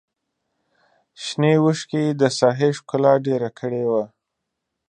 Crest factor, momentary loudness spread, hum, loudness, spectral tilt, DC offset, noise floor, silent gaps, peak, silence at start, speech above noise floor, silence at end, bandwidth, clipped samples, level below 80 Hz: 20 dB; 9 LU; none; -20 LUFS; -6 dB/octave; under 0.1%; -80 dBFS; none; -2 dBFS; 1.2 s; 60 dB; 0.8 s; 9.8 kHz; under 0.1%; -70 dBFS